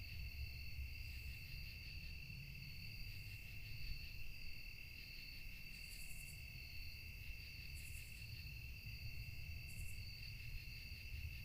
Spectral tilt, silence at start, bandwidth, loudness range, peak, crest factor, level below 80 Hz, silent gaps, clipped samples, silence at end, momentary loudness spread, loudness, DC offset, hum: -3.5 dB/octave; 0 s; 15.5 kHz; 1 LU; -34 dBFS; 16 dB; -54 dBFS; none; under 0.1%; 0 s; 2 LU; -52 LUFS; under 0.1%; none